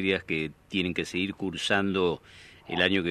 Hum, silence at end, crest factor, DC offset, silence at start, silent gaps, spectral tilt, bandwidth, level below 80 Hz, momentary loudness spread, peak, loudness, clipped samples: none; 0 s; 22 dB; under 0.1%; 0 s; none; -5 dB/octave; 13 kHz; -60 dBFS; 8 LU; -6 dBFS; -28 LUFS; under 0.1%